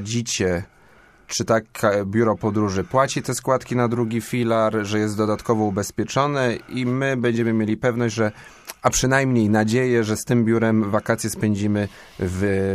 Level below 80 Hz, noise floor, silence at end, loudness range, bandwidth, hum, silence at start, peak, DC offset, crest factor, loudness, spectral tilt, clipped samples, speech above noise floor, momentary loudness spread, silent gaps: -48 dBFS; -52 dBFS; 0 s; 2 LU; 15.5 kHz; none; 0 s; -2 dBFS; under 0.1%; 20 dB; -21 LUFS; -5.5 dB/octave; under 0.1%; 31 dB; 6 LU; none